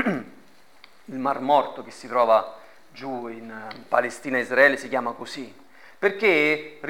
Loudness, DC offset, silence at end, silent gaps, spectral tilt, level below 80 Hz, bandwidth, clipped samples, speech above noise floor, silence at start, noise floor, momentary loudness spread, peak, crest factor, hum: -23 LUFS; 0.3%; 0 s; none; -4.5 dB/octave; -74 dBFS; 17 kHz; under 0.1%; 31 dB; 0 s; -55 dBFS; 19 LU; -4 dBFS; 22 dB; none